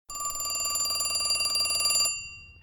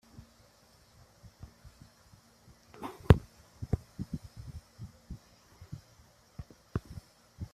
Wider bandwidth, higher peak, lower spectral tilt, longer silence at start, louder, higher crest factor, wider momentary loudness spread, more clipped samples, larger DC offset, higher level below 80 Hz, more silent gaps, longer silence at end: first, 19.5 kHz vs 14 kHz; second, -12 dBFS vs -4 dBFS; second, 2 dB/octave vs -8 dB/octave; about the same, 0.1 s vs 0.2 s; first, -25 LUFS vs -33 LUFS; second, 16 dB vs 34 dB; second, 9 LU vs 30 LU; neither; neither; second, -56 dBFS vs -46 dBFS; neither; about the same, 0.1 s vs 0.1 s